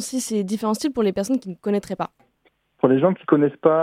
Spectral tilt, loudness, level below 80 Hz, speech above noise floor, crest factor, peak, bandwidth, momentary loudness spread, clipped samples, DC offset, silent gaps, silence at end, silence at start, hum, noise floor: -6 dB/octave; -22 LUFS; -60 dBFS; 44 dB; 20 dB; -2 dBFS; 16 kHz; 7 LU; under 0.1%; under 0.1%; none; 0 s; 0 s; none; -65 dBFS